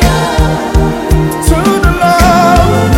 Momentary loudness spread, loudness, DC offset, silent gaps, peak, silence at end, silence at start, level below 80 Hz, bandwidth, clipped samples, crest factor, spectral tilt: 5 LU; -9 LUFS; under 0.1%; none; 0 dBFS; 0 s; 0 s; -14 dBFS; 17 kHz; 1%; 8 dB; -5.5 dB/octave